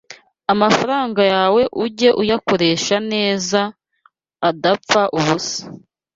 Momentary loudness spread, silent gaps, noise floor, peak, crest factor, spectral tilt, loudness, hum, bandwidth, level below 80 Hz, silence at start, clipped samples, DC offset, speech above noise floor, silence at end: 7 LU; none; -58 dBFS; 0 dBFS; 16 dB; -4 dB/octave; -17 LUFS; none; 7.8 kHz; -56 dBFS; 0.1 s; under 0.1%; under 0.1%; 42 dB; 0.4 s